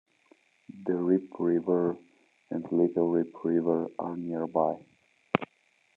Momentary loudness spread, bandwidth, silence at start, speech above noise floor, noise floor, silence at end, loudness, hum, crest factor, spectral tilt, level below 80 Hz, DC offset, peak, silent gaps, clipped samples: 11 LU; 4 kHz; 0.75 s; 40 dB; -68 dBFS; 0.5 s; -29 LUFS; none; 26 dB; -9.5 dB/octave; -78 dBFS; under 0.1%; -4 dBFS; none; under 0.1%